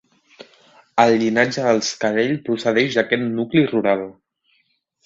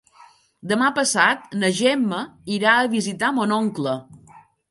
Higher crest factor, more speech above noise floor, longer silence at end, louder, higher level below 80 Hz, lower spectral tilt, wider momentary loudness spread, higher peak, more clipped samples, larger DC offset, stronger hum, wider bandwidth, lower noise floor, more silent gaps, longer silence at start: about the same, 20 dB vs 20 dB; first, 47 dB vs 31 dB; first, 0.95 s vs 0.3 s; about the same, -19 LUFS vs -20 LUFS; first, -62 dBFS vs -68 dBFS; first, -5 dB/octave vs -3.5 dB/octave; second, 5 LU vs 10 LU; about the same, 0 dBFS vs -2 dBFS; neither; neither; neither; second, 8 kHz vs 11.5 kHz; first, -66 dBFS vs -52 dBFS; neither; first, 0.95 s vs 0.65 s